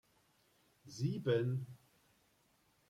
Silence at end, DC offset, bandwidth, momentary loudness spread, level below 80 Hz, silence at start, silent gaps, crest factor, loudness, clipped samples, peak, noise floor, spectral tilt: 1.15 s; under 0.1%; 13 kHz; 18 LU; -78 dBFS; 0.85 s; none; 20 dB; -38 LUFS; under 0.1%; -22 dBFS; -74 dBFS; -7 dB/octave